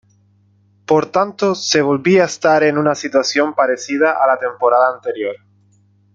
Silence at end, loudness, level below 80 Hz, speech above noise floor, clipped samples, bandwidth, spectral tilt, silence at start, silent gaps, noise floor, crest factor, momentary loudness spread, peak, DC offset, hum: 0.8 s; -15 LUFS; -62 dBFS; 40 dB; under 0.1%; 7.8 kHz; -4.5 dB/octave; 0.9 s; none; -55 dBFS; 16 dB; 6 LU; -2 dBFS; under 0.1%; 50 Hz at -50 dBFS